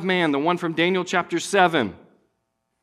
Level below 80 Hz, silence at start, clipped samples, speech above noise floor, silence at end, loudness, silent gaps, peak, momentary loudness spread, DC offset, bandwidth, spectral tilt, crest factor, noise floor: -66 dBFS; 0 s; under 0.1%; 54 dB; 0.85 s; -21 LUFS; none; -2 dBFS; 5 LU; under 0.1%; 13.5 kHz; -4.5 dB/octave; 20 dB; -75 dBFS